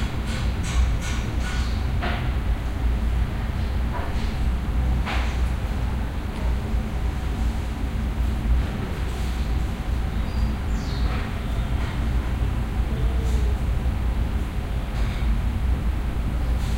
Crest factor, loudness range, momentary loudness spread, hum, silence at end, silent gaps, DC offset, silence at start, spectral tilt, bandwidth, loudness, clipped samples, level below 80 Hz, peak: 12 dB; 1 LU; 3 LU; none; 0 s; none; under 0.1%; 0 s; -6.5 dB/octave; 13.5 kHz; -26 LUFS; under 0.1%; -24 dBFS; -10 dBFS